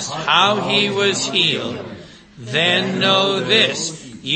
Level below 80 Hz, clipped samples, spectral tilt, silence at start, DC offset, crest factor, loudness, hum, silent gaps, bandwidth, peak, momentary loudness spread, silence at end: -58 dBFS; under 0.1%; -3 dB/octave; 0 s; under 0.1%; 18 dB; -16 LUFS; none; none; 8.8 kHz; 0 dBFS; 12 LU; 0 s